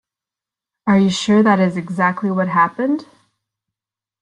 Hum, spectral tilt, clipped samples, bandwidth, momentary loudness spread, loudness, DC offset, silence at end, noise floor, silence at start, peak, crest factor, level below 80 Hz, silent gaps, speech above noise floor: none; -6 dB/octave; under 0.1%; 10 kHz; 8 LU; -17 LUFS; under 0.1%; 1.2 s; -89 dBFS; 0.85 s; -2 dBFS; 16 dB; -60 dBFS; none; 73 dB